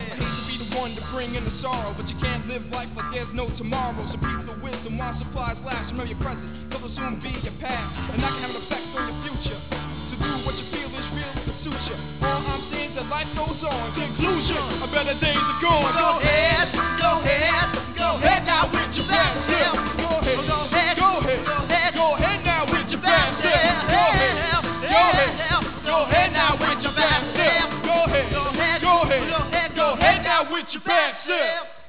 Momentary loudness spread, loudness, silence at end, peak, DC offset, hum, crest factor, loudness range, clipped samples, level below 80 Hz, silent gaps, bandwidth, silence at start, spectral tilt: 12 LU; -22 LUFS; 0.05 s; -2 dBFS; 0.9%; none; 20 dB; 10 LU; under 0.1%; -36 dBFS; none; 4 kHz; 0 s; -8.5 dB/octave